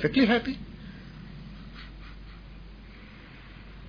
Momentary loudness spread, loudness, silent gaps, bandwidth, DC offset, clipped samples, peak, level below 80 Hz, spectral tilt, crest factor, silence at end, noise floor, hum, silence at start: 24 LU; -26 LUFS; none; 5.2 kHz; under 0.1%; under 0.1%; -10 dBFS; -48 dBFS; -7.5 dB/octave; 22 dB; 0 s; -47 dBFS; none; 0 s